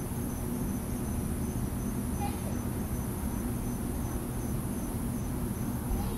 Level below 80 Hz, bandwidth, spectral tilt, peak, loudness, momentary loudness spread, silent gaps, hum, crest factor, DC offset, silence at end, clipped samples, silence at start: -40 dBFS; 16 kHz; -6.5 dB/octave; -20 dBFS; -34 LUFS; 1 LU; none; none; 12 dB; under 0.1%; 0 s; under 0.1%; 0 s